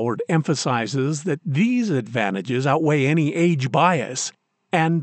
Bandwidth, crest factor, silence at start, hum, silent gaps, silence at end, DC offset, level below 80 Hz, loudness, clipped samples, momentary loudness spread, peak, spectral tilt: 9 kHz; 16 dB; 0 s; none; none; 0 s; under 0.1%; -74 dBFS; -21 LUFS; under 0.1%; 6 LU; -4 dBFS; -5.5 dB/octave